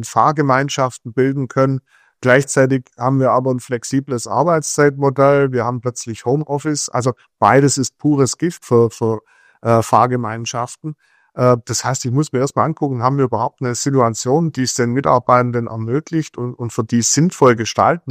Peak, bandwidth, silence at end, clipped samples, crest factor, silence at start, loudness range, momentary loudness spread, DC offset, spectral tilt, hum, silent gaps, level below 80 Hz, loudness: 0 dBFS; 15.5 kHz; 0 s; under 0.1%; 16 dB; 0 s; 2 LU; 9 LU; under 0.1%; -5 dB/octave; none; none; -56 dBFS; -17 LUFS